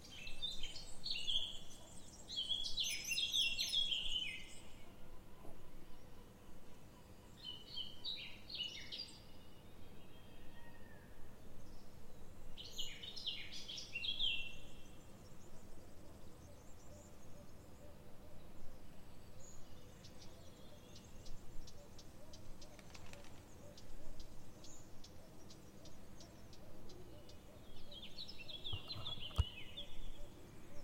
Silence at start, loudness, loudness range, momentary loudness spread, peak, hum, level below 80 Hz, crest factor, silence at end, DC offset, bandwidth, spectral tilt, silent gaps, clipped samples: 0 s; -42 LUFS; 21 LU; 22 LU; -22 dBFS; none; -56 dBFS; 22 dB; 0 s; under 0.1%; 16.5 kHz; -2 dB/octave; none; under 0.1%